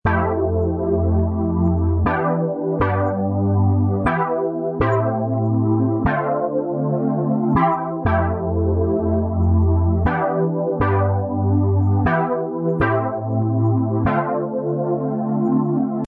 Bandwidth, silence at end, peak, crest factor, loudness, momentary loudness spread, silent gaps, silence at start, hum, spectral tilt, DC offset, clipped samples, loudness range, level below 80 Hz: 4.1 kHz; 0 s; -6 dBFS; 12 dB; -20 LUFS; 4 LU; none; 0.05 s; none; -11.5 dB/octave; under 0.1%; under 0.1%; 1 LU; -38 dBFS